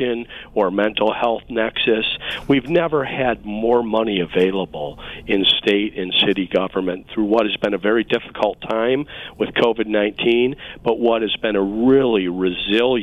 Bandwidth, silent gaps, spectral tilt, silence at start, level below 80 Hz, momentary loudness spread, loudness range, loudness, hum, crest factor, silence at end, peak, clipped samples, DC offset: 8.4 kHz; none; -6.5 dB/octave; 0 s; -46 dBFS; 8 LU; 2 LU; -19 LUFS; none; 14 dB; 0 s; -4 dBFS; under 0.1%; under 0.1%